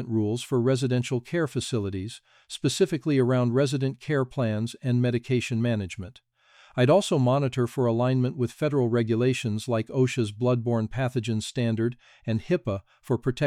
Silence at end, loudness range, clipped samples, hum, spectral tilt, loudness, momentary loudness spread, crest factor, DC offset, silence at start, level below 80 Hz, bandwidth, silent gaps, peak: 0 s; 3 LU; under 0.1%; none; -6.5 dB/octave; -26 LUFS; 8 LU; 16 dB; under 0.1%; 0 s; -58 dBFS; 13.5 kHz; none; -10 dBFS